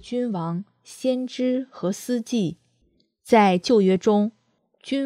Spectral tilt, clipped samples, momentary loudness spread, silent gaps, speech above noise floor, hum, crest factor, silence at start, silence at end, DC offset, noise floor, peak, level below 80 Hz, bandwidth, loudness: -6 dB/octave; under 0.1%; 12 LU; none; 44 dB; none; 20 dB; 0.05 s; 0 s; under 0.1%; -66 dBFS; -4 dBFS; -66 dBFS; 14.5 kHz; -23 LUFS